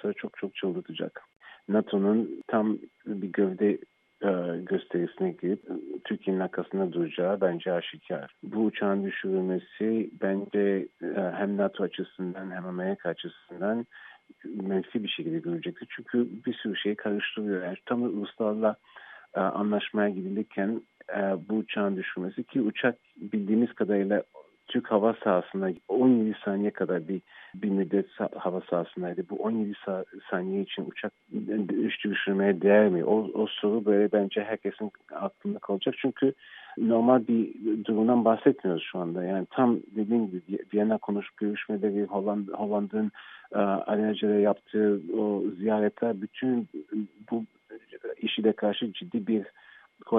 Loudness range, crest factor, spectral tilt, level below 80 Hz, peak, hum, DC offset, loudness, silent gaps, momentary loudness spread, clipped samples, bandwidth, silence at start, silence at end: 6 LU; 20 dB; -10 dB/octave; -82 dBFS; -8 dBFS; none; under 0.1%; -29 LUFS; 1.36-1.40 s; 11 LU; under 0.1%; 3.9 kHz; 0.05 s; 0 s